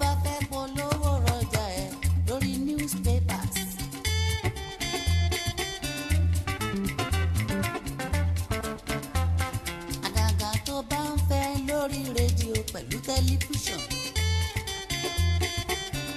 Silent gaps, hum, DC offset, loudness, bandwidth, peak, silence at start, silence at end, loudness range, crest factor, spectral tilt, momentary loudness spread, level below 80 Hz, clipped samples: none; none; under 0.1%; -28 LUFS; 13.5 kHz; -12 dBFS; 0 s; 0 s; 1 LU; 16 dB; -4.5 dB/octave; 5 LU; -36 dBFS; under 0.1%